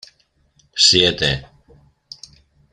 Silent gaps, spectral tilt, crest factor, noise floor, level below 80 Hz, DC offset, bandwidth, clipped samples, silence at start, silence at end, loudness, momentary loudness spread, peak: none; -2.5 dB/octave; 22 dB; -61 dBFS; -46 dBFS; under 0.1%; 13 kHz; under 0.1%; 0.75 s; 1.3 s; -14 LUFS; 27 LU; 0 dBFS